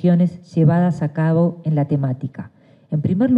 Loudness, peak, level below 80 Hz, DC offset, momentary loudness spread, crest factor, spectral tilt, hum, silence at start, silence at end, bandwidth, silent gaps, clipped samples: -19 LUFS; -4 dBFS; -56 dBFS; under 0.1%; 11 LU; 12 dB; -10.5 dB/octave; none; 0 s; 0 s; 5.2 kHz; none; under 0.1%